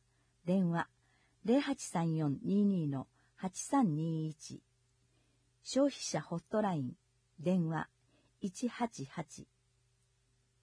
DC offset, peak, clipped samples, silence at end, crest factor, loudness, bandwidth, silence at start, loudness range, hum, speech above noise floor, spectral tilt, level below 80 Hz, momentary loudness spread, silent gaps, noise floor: under 0.1%; -20 dBFS; under 0.1%; 1.2 s; 16 dB; -36 LUFS; 11 kHz; 0.45 s; 6 LU; none; 40 dB; -6 dB/octave; -76 dBFS; 14 LU; none; -75 dBFS